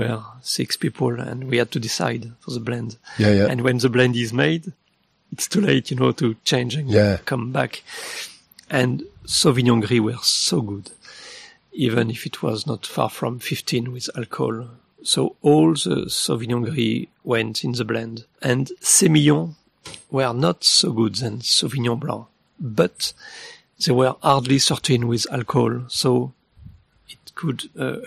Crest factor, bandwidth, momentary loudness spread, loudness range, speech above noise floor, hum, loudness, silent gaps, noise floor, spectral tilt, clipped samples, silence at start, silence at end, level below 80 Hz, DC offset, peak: 20 dB; 15 kHz; 16 LU; 5 LU; 44 dB; none; -20 LUFS; none; -64 dBFS; -4.5 dB/octave; under 0.1%; 0 s; 0 s; -56 dBFS; under 0.1%; -2 dBFS